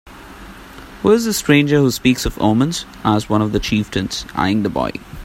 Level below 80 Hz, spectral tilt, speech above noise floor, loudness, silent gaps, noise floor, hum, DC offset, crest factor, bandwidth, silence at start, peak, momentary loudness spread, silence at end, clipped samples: -36 dBFS; -5 dB/octave; 20 dB; -17 LUFS; none; -37 dBFS; none; under 0.1%; 18 dB; 16.5 kHz; 0.05 s; 0 dBFS; 23 LU; 0 s; under 0.1%